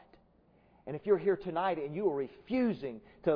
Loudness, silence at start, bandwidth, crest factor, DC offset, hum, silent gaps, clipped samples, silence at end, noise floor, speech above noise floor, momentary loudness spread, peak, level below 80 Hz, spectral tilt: -33 LUFS; 0.85 s; 5.2 kHz; 18 dB; under 0.1%; none; none; under 0.1%; 0 s; -66 dBFS; 33 dB; 13 LU; -16 dBFS; -66 dBFS; -6 dB/octave